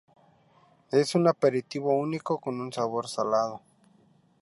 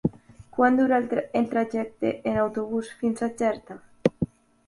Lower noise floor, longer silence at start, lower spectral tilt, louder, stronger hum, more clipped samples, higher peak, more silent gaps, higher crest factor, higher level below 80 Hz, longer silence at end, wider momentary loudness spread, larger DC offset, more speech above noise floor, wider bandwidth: first, -62 dBFS vs -44 dBFS; first, 0.9 s vs 0.05 s; about the same, -6 dB/octave vs -7 dB/octave; about the same, -27 LUFS vs -26 LUFS; neither; neither; second, -8 dBFS vs -4 dBFS; neither; about the same, 20 dB vs 22 dB; second, -76 dBFS vs -56 dBFS; first, 0.85 s vs 0.4 s; second, 8 LU vs 11 LU; neither; first, 36 dB vs 20 dB; about the same, 11.5 kHz vs 11.5 kHz